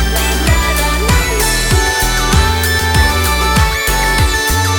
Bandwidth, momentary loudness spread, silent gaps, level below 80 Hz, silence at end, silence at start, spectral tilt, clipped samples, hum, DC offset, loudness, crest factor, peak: over 20 kHz; 1 LU; none; -16 dBFS; 0 s; 0 s; -3.5 dB/octave; under 0.1%; none; under 0.1%; -12 LUFS; 12 dB; 0 dBFS